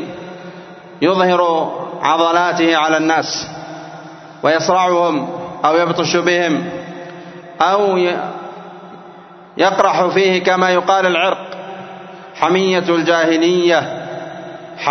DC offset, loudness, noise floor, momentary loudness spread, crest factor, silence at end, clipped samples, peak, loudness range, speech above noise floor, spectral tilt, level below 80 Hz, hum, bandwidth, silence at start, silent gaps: under 0.1%; -15 LUFS; -38 dBFS; 20 LU; 16 dB; 0 s; under 0.1%; 0 dBFS; 2 LU; 25 dB; -4.5 dB/octave; -62 dBFS; none; 6.4 kHz; 0 s; none